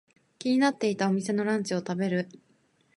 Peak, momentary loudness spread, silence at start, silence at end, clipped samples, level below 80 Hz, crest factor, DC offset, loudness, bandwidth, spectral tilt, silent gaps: -12 dBFS; 7 LU; 0.4 s; 0.65 s; under 0.1%; -76 dBFS; 16 dB; under 0.1%; -28 LUFS; 11.5 kHz; -5.5 dB/octave; none